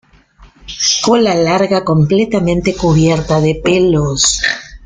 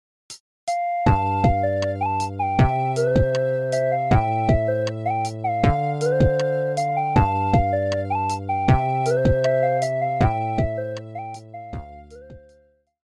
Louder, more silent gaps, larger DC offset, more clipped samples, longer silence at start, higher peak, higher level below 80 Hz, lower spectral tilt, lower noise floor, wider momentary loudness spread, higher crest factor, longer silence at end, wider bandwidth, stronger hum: first, -12 LUFS vs -21 LUFS; second, none vs 0.40-0.67 s; neither; neither; about the same, 0.4 s vs 0.3 s; first, 0 dBFS vs -4 dBFS; about the same, -34 dBFS vs -34 dBFS; second, -4.5 dB/octave vs -7 dB/octave; second, -44 dBFS vs -59 dBFS; second, 4 LU vs 14 LU; second, 12 dB vs 18 dB; second, 0 s vs 0.7 s; second, 9.6 kHz vs 12 kHz; neither